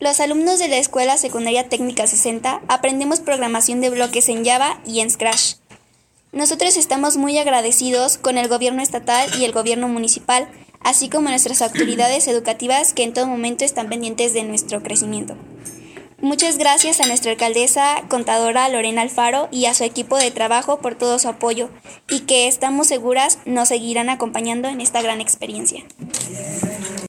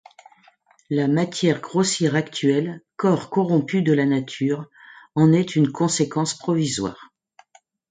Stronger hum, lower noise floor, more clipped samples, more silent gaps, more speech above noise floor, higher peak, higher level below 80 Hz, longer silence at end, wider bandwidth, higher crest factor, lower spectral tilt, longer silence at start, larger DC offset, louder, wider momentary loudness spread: neither; about the same, -57 dBFS vs -57 dBFS; neither; neither; about the same, 39 dB vs 37 dB; first, 0 dBFS vs -4 dBFS; about the same, -60 dBFS vs -62 dBFS; second, 0 s vs 0.85 s; first, 17 kHz vs 9.6 kHz; about the same, 18 dB vs 18 dB; second, -1.5 dB/octave vs -5.5 dB/octave; second, 0 s vs 0.9 s; neither; first, -17 LUFS vs -21 LUFS; about the same, 9 LU vs 8 LU